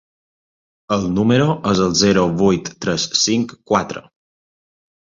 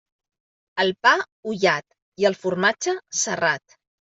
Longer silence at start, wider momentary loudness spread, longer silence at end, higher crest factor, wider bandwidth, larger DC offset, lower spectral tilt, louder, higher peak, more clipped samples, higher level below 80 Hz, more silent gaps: first, 0.9 s vs 0.75 s; about the same, 8 LU vs 8 LU; first, 1.05 s vs 0.5 s; about the same, 18 dB vs 20 dB; about the same, 7.6 kHz vs 8 kHz; neither; first, -4.5 dB/octave vs -2.5 dB/octave; first, -17 LUFS vs -22 LUFS; about the same, -2 dBFS vs -4 dBFS; neither; first, -46 dBFS vs -70 dBFS; second, none vs 1.32-1.43 s, 2.02-2.12 s